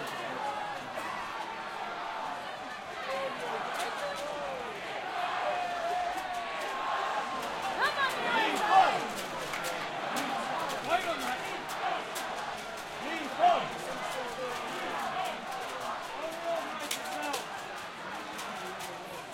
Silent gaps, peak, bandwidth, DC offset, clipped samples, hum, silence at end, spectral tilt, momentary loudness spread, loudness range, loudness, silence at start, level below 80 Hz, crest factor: none; -10 dBFS; 16.5 kHz; under 0.1%; under 0.1%; none; 0 s; -2.5 dB/octave; 10 LU; 7 LU; -33 LUFS; 0 s; -66 dBFS; 24 dB